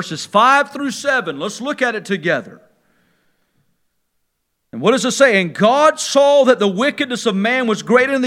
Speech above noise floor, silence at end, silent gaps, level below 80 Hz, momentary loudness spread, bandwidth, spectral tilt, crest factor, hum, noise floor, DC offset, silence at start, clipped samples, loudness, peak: 55 dB; 0 s; none; -70 dBFS; 9 LU; 14.5 kHz; -4 dB/octave; 16 dB; none; -70 dBFS; under 0.1%; 0 s; under 0.1%; -15 LUFS; 0 dBFS